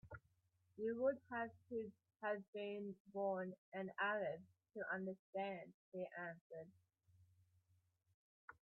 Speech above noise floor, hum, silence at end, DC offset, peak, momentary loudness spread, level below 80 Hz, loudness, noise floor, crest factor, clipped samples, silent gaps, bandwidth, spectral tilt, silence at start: 35 dB; none; 0.1 s; under 0.1%; -28 dBFS; 16 LU; -84 dBFS; -47 LUFS; -81 dBFS; 20 dB; under 0.1%; 2.48-2.53 s, 3.00-3.05 s, 3.58-3.72 s, 5.19-5.33 s, 5.74-5.92 s, 6.41-6.50 s, 8.14-8.48 s; 4.2 kHz; -4 dB/octave; 0.05 s